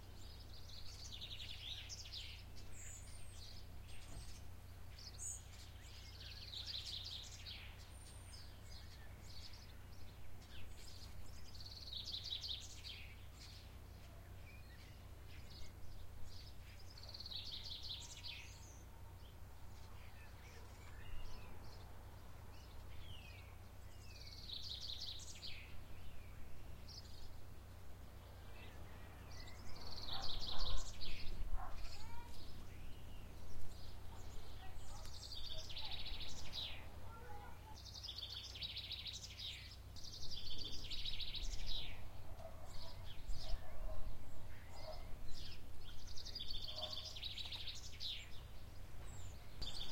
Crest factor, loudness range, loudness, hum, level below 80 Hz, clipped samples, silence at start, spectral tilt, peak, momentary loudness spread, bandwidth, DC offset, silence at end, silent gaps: 20 dB; 9 LU; -51 LUFS; none; -54 dBFS; under 0.1%; 0 s; -3 dB/octave; -24 dBFS; 12 LU; 16.5 kHz; under 0.1%; 0 s; none